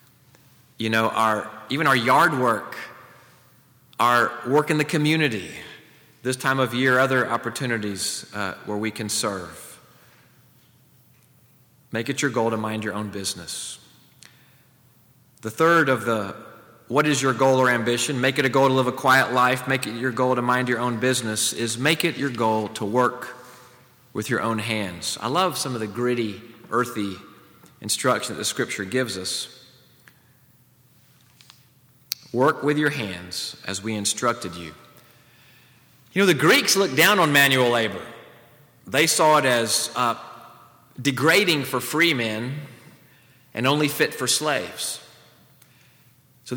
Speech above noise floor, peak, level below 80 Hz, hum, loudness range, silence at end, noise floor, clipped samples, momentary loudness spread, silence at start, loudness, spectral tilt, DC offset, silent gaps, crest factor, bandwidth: 35 dB; -2 dBFS; -68 dBFS; none; 10 LU; 0 s; -57 dBFS; under 0.1%; 16 LU; 0.8 s; -22 LUFS; -3.5 dB/octave; under 0.1%; none; 22 dB; over 20 kHz